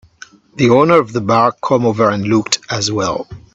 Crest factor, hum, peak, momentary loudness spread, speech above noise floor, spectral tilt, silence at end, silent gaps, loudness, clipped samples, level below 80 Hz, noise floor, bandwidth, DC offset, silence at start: 14 dB; none; 0 dBFS; 8 LU; 28 dB; -5 dB/octave; 0.15 s; none; -14 LUFS; under 0.1%; -50 dBFS; -41 dBFS; 8.2 kHz; under 0.1%; 0.55 s